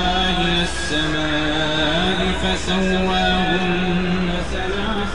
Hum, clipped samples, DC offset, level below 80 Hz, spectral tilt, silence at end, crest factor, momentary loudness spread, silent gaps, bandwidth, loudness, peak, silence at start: none; under 0.1%; 4%; -30 dBFS; -4.5 dB/octave; 0 s; 14 dB; 5 LU; none; 11 kHz; -19 LUFS; -6 dBFS; 0 s